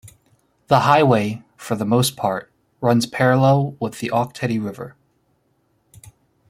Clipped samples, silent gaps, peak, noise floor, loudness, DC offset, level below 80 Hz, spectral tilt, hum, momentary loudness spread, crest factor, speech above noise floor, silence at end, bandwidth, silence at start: under 0.1%; none; -2 dBFS; -65 dBFS; -19 LUFS; under 0.1%; -58 dBFS; -6 dB/octave; none; 14 LU; 20 dB; 47 dB; 1.6 s; 15.5 kHz; 0.05 s